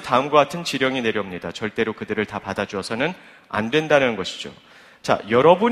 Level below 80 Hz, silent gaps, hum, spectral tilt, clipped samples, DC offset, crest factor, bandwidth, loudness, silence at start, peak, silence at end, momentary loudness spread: -58 dBFS; none; none; -5 dB/octave; under 0.1%; under 0.1%; 20 dB; 14 kHz; -21 LUFS; 0 s; 0 dBFS; 0 s; 12 LU